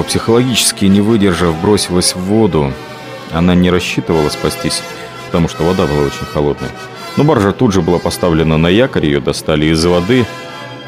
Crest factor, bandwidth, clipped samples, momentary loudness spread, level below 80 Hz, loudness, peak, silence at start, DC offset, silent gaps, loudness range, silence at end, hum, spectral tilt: 12 dB; 16 kHz; under 0.1%; 10 LU; -36 dBFS; -13 LUFS; 0 dBFS; 0 s; under 0.1%; none; 3 LU; 0 s; none; -5 dB/octave